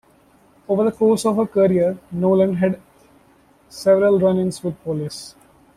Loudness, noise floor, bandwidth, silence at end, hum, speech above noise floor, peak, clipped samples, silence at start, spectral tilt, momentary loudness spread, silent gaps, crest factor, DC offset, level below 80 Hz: -19 LUFS; -54 dBFS; 14 kHz; 0.45 s; none; 36 dB; -4 dBFS; under 0.1%; 0.7 s; -7 dB/octave; 14 LU; none; 14 dB; under 0.1%; -56 dBFS